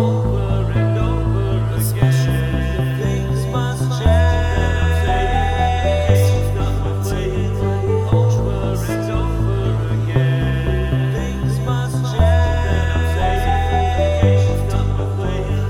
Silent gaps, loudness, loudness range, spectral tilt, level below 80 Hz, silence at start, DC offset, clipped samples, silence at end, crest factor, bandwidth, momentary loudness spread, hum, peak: none; -18 LUFS; 2 LU; -7 dB/octave; -24 dBFS; 0 s; under 0.1%; under 0.1%; 0 s; 16 dB; 17 kHz; 6 LU; none; 0 dBFS